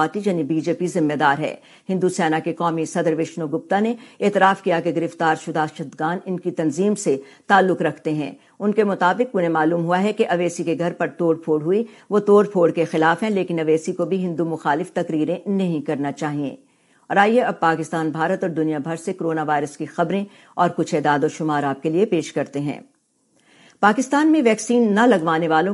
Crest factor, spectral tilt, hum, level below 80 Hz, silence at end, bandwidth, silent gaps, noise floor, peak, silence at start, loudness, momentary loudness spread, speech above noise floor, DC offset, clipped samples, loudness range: 20 dB; -6 dB/octave; none; -74 dBFS; 0 s; 11.5 kHz; none; -63 dBFS; 0 dBFS; 0 s; -20 LUFS; 9 LU; 43 dB; under 0.1%; under 0.1%; 3 LU